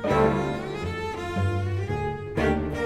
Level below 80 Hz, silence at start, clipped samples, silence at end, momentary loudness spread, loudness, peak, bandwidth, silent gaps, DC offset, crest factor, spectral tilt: -40 dBFS; 0 s; under 0.1%; 0 s; 8 LU; -27 LUFS; -10 dBFS; 12.5 kHz; none; under 0.1%; 16 dB; -7 dB/octave